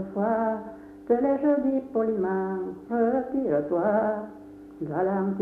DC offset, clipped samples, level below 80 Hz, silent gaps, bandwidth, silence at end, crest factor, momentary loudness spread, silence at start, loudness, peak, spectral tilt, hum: under 0.1%; under 0.1%; -62 dBFS; none; 4 kHz; 0 s; 16 dB; 14 LU; 0 s; -26 LUFS; -10 dBFS; -10.5 dB/octave; none